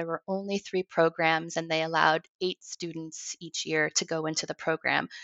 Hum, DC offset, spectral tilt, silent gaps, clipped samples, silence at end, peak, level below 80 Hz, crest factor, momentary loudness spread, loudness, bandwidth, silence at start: none; under 0.1%; -3 dB/octave; 2.29-2.39 s; under 0.1%; 0 s; -8 dBFS; -74 dBFS; 22 dB; 12 LU; -29 LUFS; 8.2 kHz; 0 s